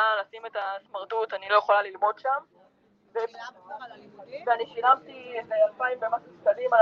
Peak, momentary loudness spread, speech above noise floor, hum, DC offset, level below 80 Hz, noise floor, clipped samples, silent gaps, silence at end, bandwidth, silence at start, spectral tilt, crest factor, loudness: -6 dBFS; 18 LU; 36 dB; none; under 0.1%; -82 dBFS; -63 dBFS; under 0.1%; none; 0 s; 6.4 kHz; 0 s; -3.5 dB/octave; 20 dB; -27 LUFS